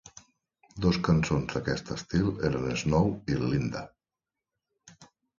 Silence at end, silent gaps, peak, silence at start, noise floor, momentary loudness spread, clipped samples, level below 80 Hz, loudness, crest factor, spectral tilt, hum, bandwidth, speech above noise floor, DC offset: 0.35 s; none; -12 dBFS; 0.05 s; -90 dBFS; 9 LU; under 0.1%; -46 dBFS; -28 LUFS; 18 dB; -6.5 dB/octave; none; 7.6 kHz; 62 dB; under 0.1%